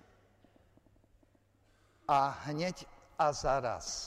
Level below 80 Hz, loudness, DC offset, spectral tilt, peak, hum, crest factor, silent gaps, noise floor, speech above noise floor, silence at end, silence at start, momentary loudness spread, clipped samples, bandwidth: -56 dBFS; -33 LUFS; under 0.1%; -4 dB/octave; -18 dBFS; none; 18 dB; none; -69 dBFS; 36 dB; 0 s; 2.1 s; 15 LU; under 0.1%; 14.5 kHz